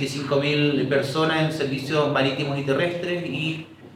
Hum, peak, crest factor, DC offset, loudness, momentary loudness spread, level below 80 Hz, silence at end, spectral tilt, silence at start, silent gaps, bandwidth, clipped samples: none; -8 dBFS; 16 dB; under 0.1%; -23 LUFS; 6 LU; -64 dBFS; 0 s; -6 dB/octave; 0 s; none; 15.5 kHz; under 0.1%